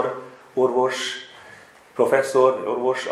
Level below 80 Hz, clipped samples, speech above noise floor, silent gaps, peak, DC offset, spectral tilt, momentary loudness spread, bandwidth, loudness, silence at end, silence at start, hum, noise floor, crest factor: -72 dBFS; under 0.1%; 27 dB; none; -4 dBFS; under 0.1%; -4 dB/octave; 17 LU; 14 kHz; -21 LUFS; 0 s; 0 s; none; -47 dBFS; 18 dB